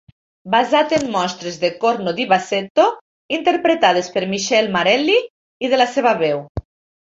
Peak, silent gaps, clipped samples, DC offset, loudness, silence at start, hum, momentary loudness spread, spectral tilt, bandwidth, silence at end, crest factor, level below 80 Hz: 0 dBFS; 2.70-2.75 s, 3.01-3.29 s, 5.30-5.60 s, 6.49-6.55 s; under 0.1%; under 0.1%; -17 LUFS; 0.45 s; none; 10 LU; -4 dB/octave; 8 kHz; 0.5 s; 18 dB; -48 dBFS